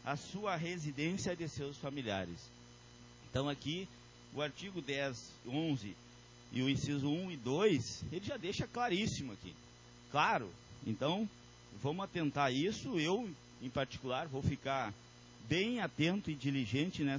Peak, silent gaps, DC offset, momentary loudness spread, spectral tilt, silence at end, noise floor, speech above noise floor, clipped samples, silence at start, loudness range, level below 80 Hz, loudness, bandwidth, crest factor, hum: -18 dBFS; none; under 0.1%; 21 LU; -5.5 dB/octave; 0 s; -58 dBFS; 20 dB; under 0.1%; 0 s; 5 LU; -62 dBFS; -38 LUFS; 7.6 kHz; 20 dB; 60 Hz at -60 dBFS